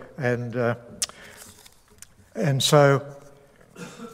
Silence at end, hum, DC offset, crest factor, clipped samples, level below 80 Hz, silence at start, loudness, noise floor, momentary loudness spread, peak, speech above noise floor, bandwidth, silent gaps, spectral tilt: 0.05 s; none; under 0.1%; 22 dB; under 0.1%; -62 dBFS; 0 s; -23 LUFS; -52 dBFS; 25 LU; -4 dBFS; 31 dB; 16 kHz; none; -4.5 dB/octave